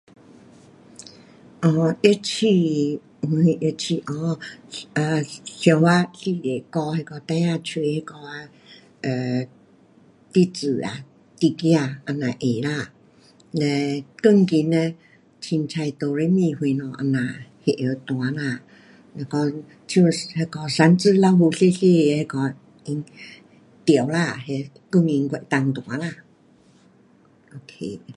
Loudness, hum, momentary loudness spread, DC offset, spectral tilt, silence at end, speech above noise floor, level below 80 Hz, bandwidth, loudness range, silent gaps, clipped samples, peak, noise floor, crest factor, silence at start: -22 LUFS; none; 16 LU; under 0.1%; -6.5 dB/octave; 0.05 s; 34 dB; -66 dBFS; 11.5 kHz; 7 LU; none; under 0.1%; 0 dBFS; -55 dBFS; 22 dB; 1 s